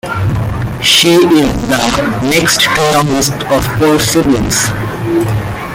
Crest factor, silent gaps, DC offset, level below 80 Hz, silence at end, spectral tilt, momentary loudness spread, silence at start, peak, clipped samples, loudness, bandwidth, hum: 12 dB; none; under 0.1%; -30 dBFS; 0 s; -4 dB/octave; 8 LU; 0.05 s; 0 dBFS; under 0.1%; -11 LUFS; 17 kHz; none